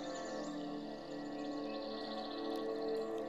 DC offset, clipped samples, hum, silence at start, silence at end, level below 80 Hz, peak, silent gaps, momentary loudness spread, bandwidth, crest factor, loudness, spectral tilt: under 0.1%; under 0.1%; none; 0 s; 0 s; -70 dBFS; -28 dBFS; none; 6 LU; 15 kHz; 12 dB; -42 LUFS; -4.5 dB/octave